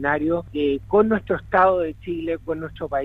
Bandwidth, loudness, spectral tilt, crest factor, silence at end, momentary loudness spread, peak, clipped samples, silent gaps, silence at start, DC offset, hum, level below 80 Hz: 4.9 kHz; -22 LUFS; -8.5 dB/octave; 16 dB; 0 s; 10 LU; -4 dBFS; under 0.1%; none; 0 s; under 0.1%; none; -44 dBFS